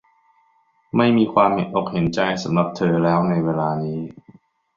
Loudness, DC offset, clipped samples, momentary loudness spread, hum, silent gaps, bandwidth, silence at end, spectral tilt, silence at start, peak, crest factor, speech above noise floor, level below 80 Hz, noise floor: -20 LUFS; under 0.1%; under 0.1%; 9 LU; none; none; 7.4 kHz; 0.65 s; -7.5 dB/octave; 0.95 s; -2 dBFS; 18 dB; 43 dB; -54 dBFS; -62 dBFS